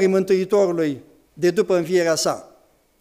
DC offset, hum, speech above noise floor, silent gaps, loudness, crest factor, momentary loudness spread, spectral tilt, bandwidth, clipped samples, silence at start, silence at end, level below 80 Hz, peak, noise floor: under 0.1%; none; 37 dB; none; -20 LUFS; 14 dB; 7 LU; -5 dB/octave; 15.5 kHz; under 0.1%; 0 s; 0.55 s; -62 dBFS; -6 dBFS; -56 dBFS